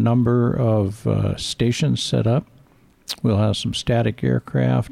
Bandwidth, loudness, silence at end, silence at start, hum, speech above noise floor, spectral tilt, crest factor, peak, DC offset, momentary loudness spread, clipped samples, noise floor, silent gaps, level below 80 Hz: 14 kHz; -20 LUFS; 0.05 s; 0 s; none; 34 dB; -6.5 dB/octave; 12 dB; -8 dBFS; 0.1%; 5 LU; under 0.1%; -53 dBFS; none; -44 dBFS